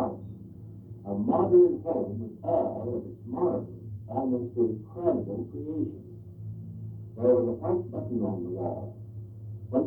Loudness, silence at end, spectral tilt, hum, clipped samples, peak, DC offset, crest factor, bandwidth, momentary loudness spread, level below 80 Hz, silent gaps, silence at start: -29 LUFS; 0 s; -13 dB/octave; none; under 0.1%; -12 dBFS; under 0.1%; 18 dB; 2 kHz; 19 LU; -60 dBFS; none; 0 s